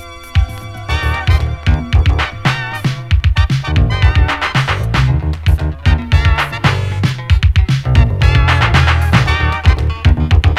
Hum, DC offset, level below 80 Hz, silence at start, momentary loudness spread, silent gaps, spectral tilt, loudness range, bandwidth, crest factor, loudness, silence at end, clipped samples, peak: none; 0.8%; -16 dBFS; 0 s; 6 LU; none; -6 dB/octave; 3 LU; 12.5 kHz; 12 dB; -14 LUFS; 0 s; under 0.1%; 0 dBFS